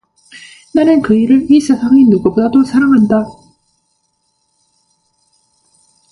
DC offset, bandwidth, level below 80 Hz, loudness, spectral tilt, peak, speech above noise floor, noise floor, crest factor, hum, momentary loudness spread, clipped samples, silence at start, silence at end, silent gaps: under 0.1%; 11.5 kHz; -50 dBFS; -10 LUFS; -7 dB/octave; 0 dBFS; 54 dB; -63 dBFS; 12 dB; none; 5 LU; under 0.1%; 0.35 s; 2.8 s; none